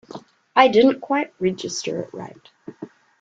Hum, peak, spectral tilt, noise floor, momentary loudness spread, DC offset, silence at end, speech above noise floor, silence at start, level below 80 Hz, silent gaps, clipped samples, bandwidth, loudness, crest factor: none; -2 dBFS; -4.5 dB/octave; -41 dBFS; 26 LU; under 0.1%; 0.35 s; 21 dB; 0.15 s; -64 dBFS; none; under 0.1%; 8 kHz; -20 LUFS; 20 dB